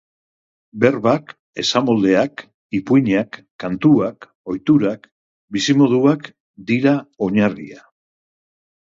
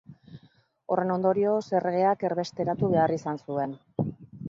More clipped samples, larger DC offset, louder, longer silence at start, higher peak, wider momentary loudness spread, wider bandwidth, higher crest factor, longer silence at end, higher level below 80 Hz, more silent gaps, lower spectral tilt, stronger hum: neither; neither; first, -18 LUFS vs -27 LUFS; first, 0.75 s vs 0.1 s; first, 0 dBFS vs -10 dBFS; first, 18 LU vs 9 LU; about the same, 7.6 kHz vs 7.6 kHz; about the same, 18 dB vs 18 dB; first, 1.1 s vs 0 s; first, -58 dBFS vs -64 dBFS; first, 1.39-1.53 s, 2.54-2.70 s, 3.51-3.59 s, 4.35-4.44 s, 5.12-5.48 s, 6.40-6.54 s vs none; second, -6 dB/octave vs -7.5 dB/octave; neither